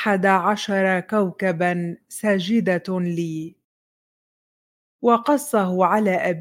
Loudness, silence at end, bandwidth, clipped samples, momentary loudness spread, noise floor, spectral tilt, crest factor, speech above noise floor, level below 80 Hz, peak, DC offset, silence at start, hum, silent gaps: -21 LUFS; 0 s; 16.5 kHz; under 0.1%; 9 LU; under -90 dBFS; -6 dB/octave; 18 dB; over 70 dB; -70 dBFS; -4 dBFS; under 0.1%; 0 s; none; 3.64-4.99 s